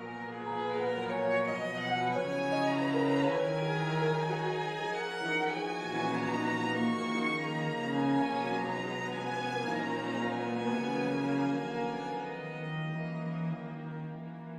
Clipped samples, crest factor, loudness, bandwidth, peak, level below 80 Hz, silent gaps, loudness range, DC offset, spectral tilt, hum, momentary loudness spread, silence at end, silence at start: under 0.1%; 14 dB; -33 LUFS; 11.5 kHz; -18 dBFS; -72 dBFS; none; 3 LU; under 0.1%; -6 dB/octave; none; 8 LU; 0 s; 0 s